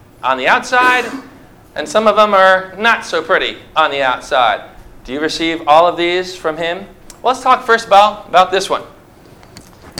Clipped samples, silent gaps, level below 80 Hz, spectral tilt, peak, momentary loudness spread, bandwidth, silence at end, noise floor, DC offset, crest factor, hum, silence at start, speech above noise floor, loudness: 0.2%; none; -46 dBFS; -3 dB/octave; 0 dBFS; 11 LU; 16.5 kHz; 0 s; -41 dBFS; under 0.1%; 14 dB; none; 0.25 s; 28 dB; -13 LUFS